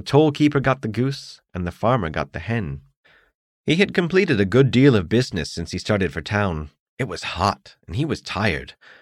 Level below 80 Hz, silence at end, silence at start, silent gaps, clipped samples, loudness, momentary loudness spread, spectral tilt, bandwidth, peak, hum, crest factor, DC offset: -44 dBFS; 0.3 s; 0.05 s; 2.97-3.04 s, 3.35-3.64 s, 6.80-6.97 s; under 0.1%; -21 LUFS; 15 LU; -6.5 dB/octave; 11.5 kHz; -4 dBFS; none; 18 dB; under 0.1%